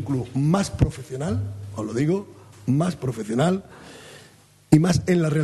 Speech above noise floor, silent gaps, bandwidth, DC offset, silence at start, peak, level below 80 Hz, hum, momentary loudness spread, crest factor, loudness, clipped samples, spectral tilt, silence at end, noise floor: 30 dB; none; 12.5 kHz; under 0.1%; 0 s; -2 dBFS; -42 dBFS; none; 17 LU; 22 dB; -23 LUFS; under 0.1%; -7 dB/octave; 0 s; -52 dBFS